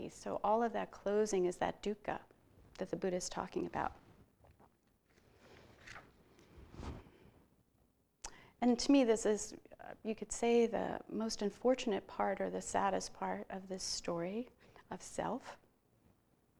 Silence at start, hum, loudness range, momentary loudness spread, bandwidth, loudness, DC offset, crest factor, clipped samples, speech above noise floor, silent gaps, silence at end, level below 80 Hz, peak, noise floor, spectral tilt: 0 s; none; 21 LU; 20 LU; 19.5 kHz; -37 LUFS; under 0.1%; 20 dB; under 0.1%; 38 dB; none; 1.05 s; -64 dBFS; -18 dBFS; -75 dBFS; -4.5 dB/octave